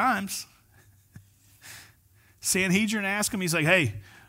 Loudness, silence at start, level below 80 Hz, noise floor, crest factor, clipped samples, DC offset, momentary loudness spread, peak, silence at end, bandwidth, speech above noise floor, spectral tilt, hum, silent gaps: -25 LUFS; 0 s; -62 dBFS; -60 dBFS; 20 dB; under 0.1%; under 0.1%; 24 LU; -8 dBFS; 0.25 s; 16 kHz; 35 dB; -3.5 dB/octave; none; none